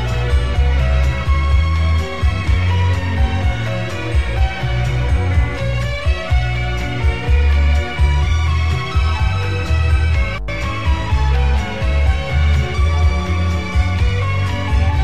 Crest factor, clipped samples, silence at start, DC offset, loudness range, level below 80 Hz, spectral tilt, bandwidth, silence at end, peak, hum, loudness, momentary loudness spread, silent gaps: 12 dB; under 0.1%; 0 s; 3%; 2 LU; -18 dBFS; -6.5 dB/octave; 8.8 kHz; 0 s; -4 dBFS; none; -18 LUFS; 4 LU; none